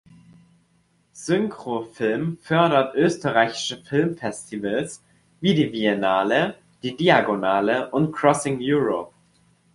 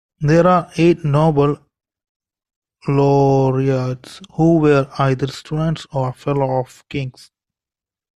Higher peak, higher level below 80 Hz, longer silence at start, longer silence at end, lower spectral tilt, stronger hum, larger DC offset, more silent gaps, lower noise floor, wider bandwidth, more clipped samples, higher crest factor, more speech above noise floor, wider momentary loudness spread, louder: about the same, -2 dBFS vs -2 dBFS; second, -60 dBFS vs -46 dBFS; first, 1.15 s vs 0.2 s; second, 0.7 s vs 1.05 s; second, -5.5 dB/octave vs -8 dB/octave; neither; neither; second, none vs 2.09-2.20 s, 2.56-2.62 s; second, -64 dBFS vs -90 dBFS; about the same, 11.5 kHz vs 11 kHz; neither; about the same, 20 dB vs 16 dB; second, 42 dB vs 74 dB; about the same, 12 LU vs 13 LU; second, -22 LUFS vs -17 LUFS